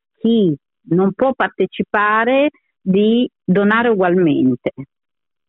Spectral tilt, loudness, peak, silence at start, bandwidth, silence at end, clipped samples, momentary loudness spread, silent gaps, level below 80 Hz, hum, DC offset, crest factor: -10 dB/octave; -16 LUFS; -4 dBFS; 0.25 s; 4.1 kHz; 0.65 s; under 0.1%; 7 LU; none; -58 dBFS; none; under 0.1%; 12 dB